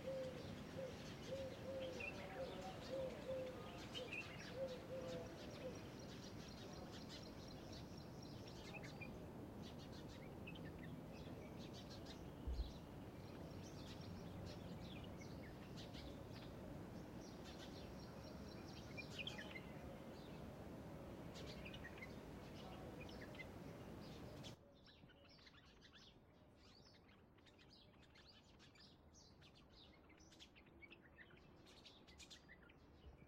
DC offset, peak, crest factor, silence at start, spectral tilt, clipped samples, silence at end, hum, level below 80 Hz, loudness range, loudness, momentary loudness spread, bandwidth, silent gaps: under 0.1%; -34 dBFS; 20 dB; 0 s; -5.5 dB/octave; under 0.1%; 0 s; none; -66 dBFS; 15 LU; -54 LUFS; 16 LU; 16 kHz; none